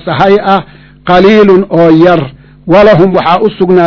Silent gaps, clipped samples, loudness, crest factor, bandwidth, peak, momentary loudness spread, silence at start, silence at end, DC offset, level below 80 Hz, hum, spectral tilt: none; 10%; -6 LUFS; 6 dB; 6 kHz; 0 dBFS; 8 LU; 0.05 s; 0 s; under 0.1%; -36 dBFS; none; -8 dB/octave